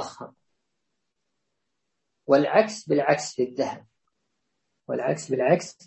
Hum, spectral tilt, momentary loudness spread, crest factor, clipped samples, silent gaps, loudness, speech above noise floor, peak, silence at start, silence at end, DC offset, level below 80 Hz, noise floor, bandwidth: none; -5 dB/octave; 21 LU; 22 dB; under 0.1%; none; -24 LUFS; 57 dB; -4 dBFS; 0 s; 0.15 s; under 0.1%; -74 dBFS; -81 dBFS; 8.6 kHz